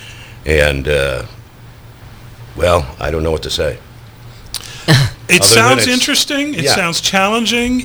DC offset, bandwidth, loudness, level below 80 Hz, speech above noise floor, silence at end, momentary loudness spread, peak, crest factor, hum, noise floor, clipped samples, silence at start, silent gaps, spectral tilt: under 0.1%; over 20 kHz; -12 LUFS; -30 dBFS; 24 dB; 0 s; 18 LU; 0 dBFS; 14 dB; none; -37 dBFS; 0.1%; 0 s; none; -3.5 dB/octave